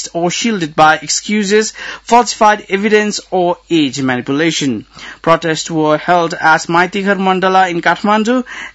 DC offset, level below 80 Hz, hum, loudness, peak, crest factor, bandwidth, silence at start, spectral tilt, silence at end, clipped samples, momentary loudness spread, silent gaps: under 0.1%; -52 dBFS; none; -13 LUFS; 0 dBFS; 14 dB; 8.6 kHz; 0 s; -4 dB/octave; 0.05 s; 0.3%; 6 LU; none